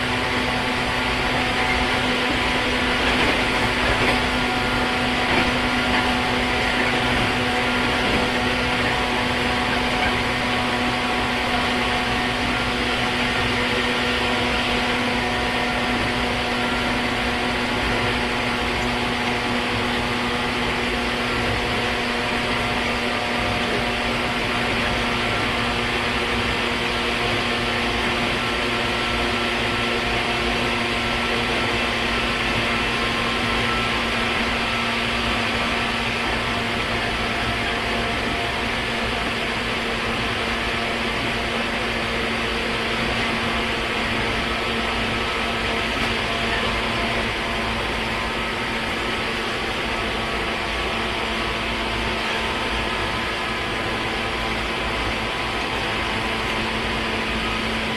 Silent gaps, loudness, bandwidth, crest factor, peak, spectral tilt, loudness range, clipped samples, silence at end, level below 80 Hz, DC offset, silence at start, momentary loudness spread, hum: none; -21 LUFS; 14 kHz; 16 dB; -6 dBFS; -4 dB/octave; 3 LU; under 0.1%; 0 s; -36 dBFS; under 0.1%; 0 s; 3 LU; none